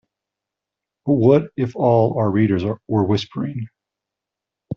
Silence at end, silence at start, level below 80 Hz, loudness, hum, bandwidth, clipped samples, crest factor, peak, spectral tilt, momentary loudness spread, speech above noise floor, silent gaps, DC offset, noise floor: 0 s; 1.05 s; -58 dBFS; -19 LUFS; none; 7 kHz; under 0.1%; 18 dB; -2 dBFS; -7.5 dB/octave; 13 LU; 68 dB; none; under 0.1%; -85 dBFS